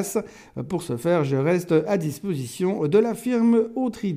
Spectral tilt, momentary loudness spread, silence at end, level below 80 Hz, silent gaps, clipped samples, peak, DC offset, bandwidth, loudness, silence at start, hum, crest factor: -7 dB/octave; 10 LU; 0 s; -60 dBFS; none; under 0.1%; -6 dBFS; under 0.1%; 15.5 kHz; -23 LUFS; 0 s; none; 18 dB